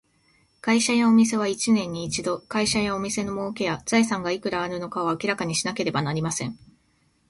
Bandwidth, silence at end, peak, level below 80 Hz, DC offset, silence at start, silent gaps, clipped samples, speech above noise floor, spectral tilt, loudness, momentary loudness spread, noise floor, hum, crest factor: 11.5 kHz; 0.75 s; -8 dBFS; -56 dBFS; under 0.1%; 0.65 s; none; under 0.1%; 41 dB; -4 dB/octave; -24 LUFS; 9 LU; -65 dBFS; none; 16 dB